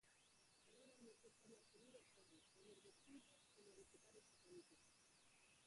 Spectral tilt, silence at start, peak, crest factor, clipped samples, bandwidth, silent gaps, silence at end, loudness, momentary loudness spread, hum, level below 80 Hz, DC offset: -2.5 dB/octave; 0 s; -52 dBFS; 18 dB; under 0.1%; 11.5 kHz; none; 0 s; -68 LUFS; 3 LU; none; under -90 dBFS; under 0.1%